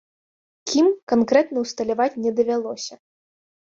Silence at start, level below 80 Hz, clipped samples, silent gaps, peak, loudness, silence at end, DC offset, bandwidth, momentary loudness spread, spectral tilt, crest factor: 0.65 s; -64 dBFS; under 0.1%; 1.03-1.07 s; -4 dBFS; -21 LUFS; 0.8 s; under 0.1%; 7.8 kHz; 13 LU; -4 dB/octave; 18 dB